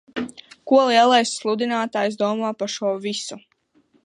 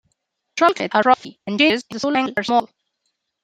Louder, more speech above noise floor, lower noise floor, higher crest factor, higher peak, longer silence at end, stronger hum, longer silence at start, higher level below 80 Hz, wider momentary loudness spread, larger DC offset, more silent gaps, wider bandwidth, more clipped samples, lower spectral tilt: about the same, -20 LUFS vs -19 LUFS; second, 42 dB vs 56 dB; second, -61 dBFS vs -74 dBFS; about the same, 18 dB vs 20 dB; about the same, -4 dBFS vs -2 dBFS; second, 0.65 s vs 0.8 s; neither; second, 0.15 s vs 0.55 s; second, -72 dBFS vs -66 dBFS; first, 16 LU vs 6 LU; neither; neither; second, 11 kHz vs 14.5 kHz; neither; about the same, -3.5 dB/octave vs -4 dB/octave